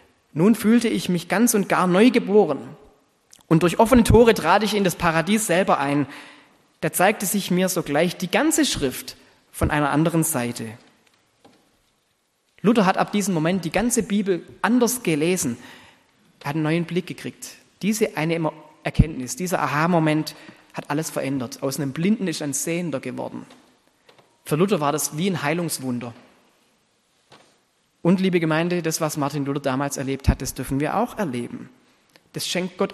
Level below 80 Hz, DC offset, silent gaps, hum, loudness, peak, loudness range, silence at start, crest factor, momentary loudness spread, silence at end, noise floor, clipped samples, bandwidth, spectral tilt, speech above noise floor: -40 dBFS; under 0.1%; none; none; -21 LUFS; 0 dBFS; 7 LU; 0.35 s; 22 dB; 13 LU; 0 s; -68 dBFS; under 0.1%; 13 kHz; -5 dB/octave; 47 dB